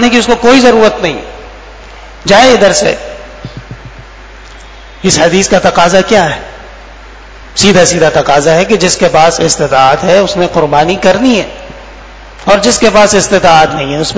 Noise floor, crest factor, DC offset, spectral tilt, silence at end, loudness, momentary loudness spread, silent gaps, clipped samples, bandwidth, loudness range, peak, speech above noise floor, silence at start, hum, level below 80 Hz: -30 dBFS; 8 dB; under 0.1%; -3.5 dB/octave; 0 s; -7 LUFS; 21 LU; none; 3%; 8 kHz; 4 LU; 0 dBFS; 23 dB; 0 s; none; -32 dBFS